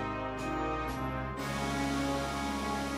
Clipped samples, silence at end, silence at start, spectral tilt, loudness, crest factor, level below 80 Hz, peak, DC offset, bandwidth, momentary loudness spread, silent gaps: under 0.1%; 0 s; 0 s; -5 dB/octave; -34 LUFS; 14 dB; -46 dBFS; -22 dBFS; under 0.1%; 16 kHz; 4 LU; none